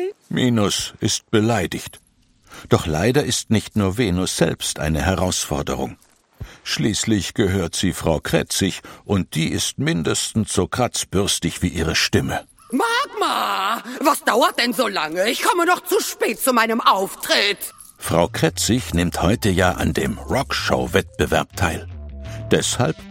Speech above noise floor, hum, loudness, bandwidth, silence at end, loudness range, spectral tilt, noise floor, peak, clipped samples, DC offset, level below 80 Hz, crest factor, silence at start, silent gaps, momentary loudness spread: 34 dB; none; -20 LUFS; 16.5 kHz; 0 s; 3 LU; -4 dB/octave; -54 dBFS; 0 dBFS; under 0.1%; under 0.1%; -40 dBFS; 20 dB; 0 s; none; 8 LU